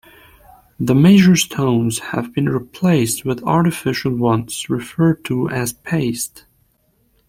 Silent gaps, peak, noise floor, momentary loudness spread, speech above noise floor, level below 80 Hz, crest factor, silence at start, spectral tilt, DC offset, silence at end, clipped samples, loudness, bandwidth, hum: none; -2 dBFS; -61 dBFS; 12 LU; 45 dB; -50 dBFS; 16 dB; 0.8 s; -5.5 dB/octave; under 0.1%; 0.9 s; under 0.1%; -17 LUFS; 16.5 kHz; none